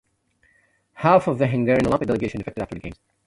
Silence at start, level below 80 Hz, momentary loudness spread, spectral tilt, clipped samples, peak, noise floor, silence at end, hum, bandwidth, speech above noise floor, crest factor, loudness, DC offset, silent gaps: 0.95 s; -48 dBFS; 14 LU; -8 dB/octave; under 0.1%; -4 dBFS; -64 dBFS; 0.35 s; none; 11.5 kHz; 43 dB; 20 dB; -21 LUFS; under 0.1%; none